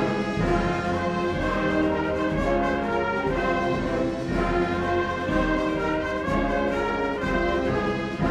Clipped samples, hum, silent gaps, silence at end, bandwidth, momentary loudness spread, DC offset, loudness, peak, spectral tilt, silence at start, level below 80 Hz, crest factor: under 0.1%; none; none; 0 s; 11.5 kHz; 2 LU; under 0.1%; -25 LUFS; -10 dBFS; -6.5 dB/octave; 0 s; -36 dBFS; 14 dB